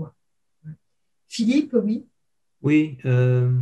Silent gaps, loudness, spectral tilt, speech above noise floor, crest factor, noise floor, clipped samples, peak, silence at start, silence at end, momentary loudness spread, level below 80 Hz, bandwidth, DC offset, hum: none; -21 LUFS; -7.5 dB/octave; 60 dB; 16 dB; -80 dBFS; under 0.1%; -6 dBFS; 0 s; 0 s; 11 LU; -68 dBFS; 9.2 kHz; under 0.1%; none